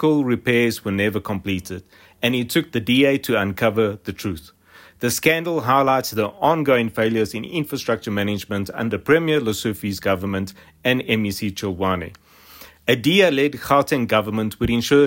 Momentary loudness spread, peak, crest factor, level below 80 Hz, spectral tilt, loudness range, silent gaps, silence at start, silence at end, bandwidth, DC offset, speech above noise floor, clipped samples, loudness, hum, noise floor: 9 LU; -4 dBFS; 16 dB; -50 dBFS; -5 dB/octave; 2 LU; none; 0 s; 0 s; 16.5 kHz; under 0.1%; 25 dB; under 0.1%; -20 LUFS; none; -45 dBFS